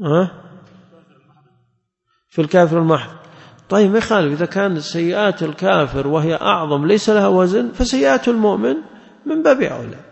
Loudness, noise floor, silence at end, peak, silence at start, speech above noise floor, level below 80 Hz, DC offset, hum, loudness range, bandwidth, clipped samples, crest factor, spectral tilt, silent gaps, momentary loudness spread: -16 LUFS; -68 dBFS; 0.1 s; -2 dBFS; 0 s; 52 dB; -40 dBFS; under 0.1%; none; 4 LU; 8.4 kHz; under 0.1%; 14 dB; -6 dB/octave; none; 8 LU